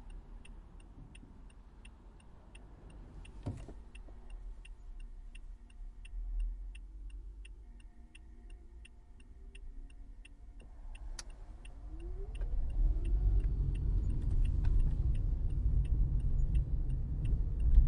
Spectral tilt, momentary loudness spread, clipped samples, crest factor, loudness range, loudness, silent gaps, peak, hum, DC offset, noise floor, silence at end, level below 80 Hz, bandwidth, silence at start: -7.5 dB/octave; 22 LU; under 0.1%; 22 dB; 20 LU; -38 LUFS; none; -12 dBFS; none; under 0.1%; -55 dBFS; 0 s; -36 dBFS; 10 kHz; 0 s